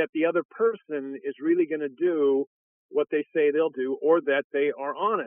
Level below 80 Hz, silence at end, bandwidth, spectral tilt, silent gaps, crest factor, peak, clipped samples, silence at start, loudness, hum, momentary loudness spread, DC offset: under -90 dBFS; 0 s; 3.6 kHz; -3.5 dB/octave; 0.09-0.13 s, 0.45-0.49 s, 2.47-2.89 s, 4.44-4.50 s; 16 dB; -10 dBFS; under 0.1%; 0 s; -26 LUFS; none; 8 LU; under 0.1%